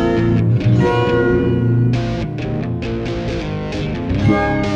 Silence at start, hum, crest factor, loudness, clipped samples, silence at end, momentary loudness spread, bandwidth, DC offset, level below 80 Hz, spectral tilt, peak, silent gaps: 0 s; none; 14 dB; -17 LUFS; under 0.1%; 0 s; 8 LU; 7.4 kHz; under 0.1%; -30 dBFS; -8 dB/octave; -4 dBFS; none